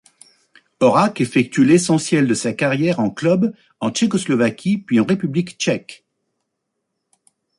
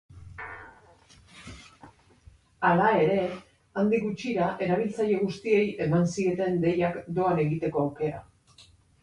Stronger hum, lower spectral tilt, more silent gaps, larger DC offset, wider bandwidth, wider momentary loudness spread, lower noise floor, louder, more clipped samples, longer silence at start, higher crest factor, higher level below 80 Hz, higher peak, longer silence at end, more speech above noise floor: neither; second, -5.5 dB/octave vs -7 dB/octave; neither; neither; about the same, 11.5 kHz vs 11 kHz; second, 8 LU vs 21 LU; first, -76 dBFS vs -57 dBFS; first, -18 LUFS vs -26 LUFS; neither; first, 0.8 s vs 0.1 s; about the same, 16 dB vs 18 dB; about the same, -60 dBFS vs -58 dBFS; first, -2 dBFS vs -10 dBFS; first, 1.65 s vs 0.8 s; first, 59 dB vs 32 dB